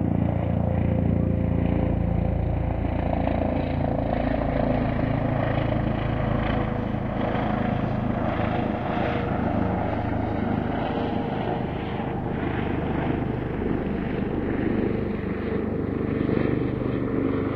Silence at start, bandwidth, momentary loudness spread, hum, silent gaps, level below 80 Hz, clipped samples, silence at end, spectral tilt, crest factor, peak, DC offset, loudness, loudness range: 0 s; 5.4 kHz; 3 LU; none; none; -36 dBFS; under 0.1%; 0 s; -10 dB/octave; 18 dB; -8 dBFS; under 0.1%; -26 LUFS; 2 LU